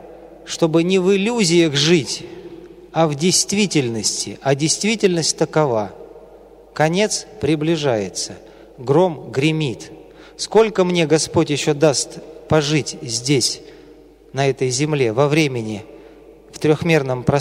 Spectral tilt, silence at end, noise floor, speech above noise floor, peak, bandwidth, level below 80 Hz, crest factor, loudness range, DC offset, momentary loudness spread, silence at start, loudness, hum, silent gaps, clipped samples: -4.5 dB/octave; 0 s; -45 dBFS; 27 dB; -2 dBFS; 16 kHz; -52 dBFS; 16 dB; 3 LU; under 0.1%; 13 LU; 0 s; -18 LUFS; none; none; under 0.1%